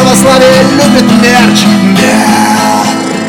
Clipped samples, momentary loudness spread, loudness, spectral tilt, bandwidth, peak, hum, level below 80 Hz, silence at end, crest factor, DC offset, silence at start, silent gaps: 1%; 4 LU; -5 LUFS; -4.5 dB/octave; 19 kHz; 0 dBFS; none; -36 dBFS; 0 s; 6 dB; under 0.1%; 0 s; none